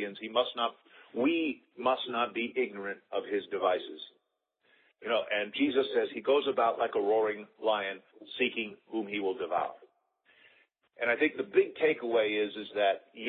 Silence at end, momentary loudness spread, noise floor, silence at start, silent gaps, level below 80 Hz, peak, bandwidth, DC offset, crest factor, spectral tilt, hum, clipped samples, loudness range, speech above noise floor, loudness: 0 s; 9 LU; -78 dBFS; 0 s; none; -78 dBFS; -12 dBFS; 4.6 kHz; under 0.1%; 20 dB; -7.5 dB/octave; none; under 0.1%; 5 LU; 47 dB; -31 LUFS